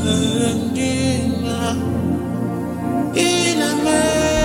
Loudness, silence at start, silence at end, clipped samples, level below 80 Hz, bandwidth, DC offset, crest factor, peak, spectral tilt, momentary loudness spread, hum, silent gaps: -19 LUFS; 0 s; 0 s; under 0.1%; -38 dBFS; 16.5 kHz; under 0.1%; 16 dB; -2 dBFS; -4.5 dB/octave; 6 LU; none; none